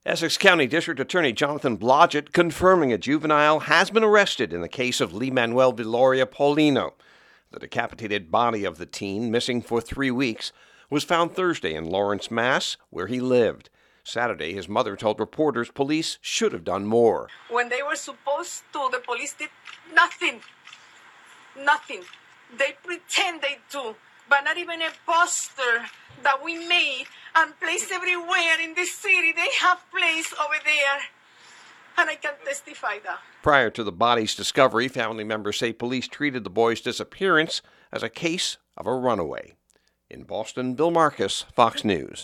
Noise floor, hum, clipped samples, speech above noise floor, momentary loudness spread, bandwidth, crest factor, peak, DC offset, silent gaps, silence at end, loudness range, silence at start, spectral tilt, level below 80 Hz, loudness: -67 dBFS; none; under 0.1%; 43 dB; 12 LU; 15.5 kHz; 24 dB; 0 dBFS; under 0.1%; none; 0 s; 6 LU; 0.05 s; -3.5 dB/octave; -58 dBFS; -23 LUFS